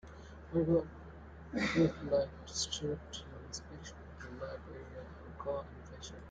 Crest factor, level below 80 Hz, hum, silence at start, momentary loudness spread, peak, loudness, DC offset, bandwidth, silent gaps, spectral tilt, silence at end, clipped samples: 20 dB; -56 dBFS; none; 0.05 s; 19 LU; -18 dBFS; -37 LUFS; under 0.1%; 9.4 kHz; none; -5 dB/octave; 0 s; under 0.1%